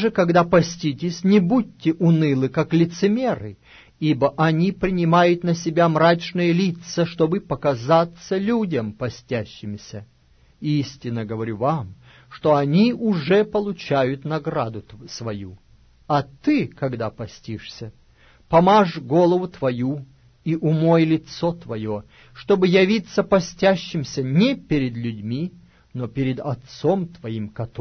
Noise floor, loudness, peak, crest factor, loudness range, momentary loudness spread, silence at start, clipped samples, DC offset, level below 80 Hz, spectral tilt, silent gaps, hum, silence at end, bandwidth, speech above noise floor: -55 dBFS; -21 LUFS; -4 dBFS; 16 dB; 7 LU; 15 LU; 0 s; under 0.1%; under 0.1%; -52 dBFS; -7 dB/octave; none; none; 0 s; 6.6 kHz; 35 dB